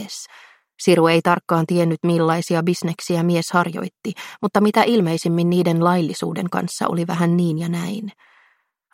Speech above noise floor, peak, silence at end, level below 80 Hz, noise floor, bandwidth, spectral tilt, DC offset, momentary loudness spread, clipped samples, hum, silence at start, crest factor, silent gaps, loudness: 43 dB; -2 dBFS; 0.85 s; -64 dBFS; -62 dBFS; 15.5 kHz; -6 dB/octave; under 0.1%; 12 LU; under 0.1%; none; 0 s; 18 dB; none; -19 LUFS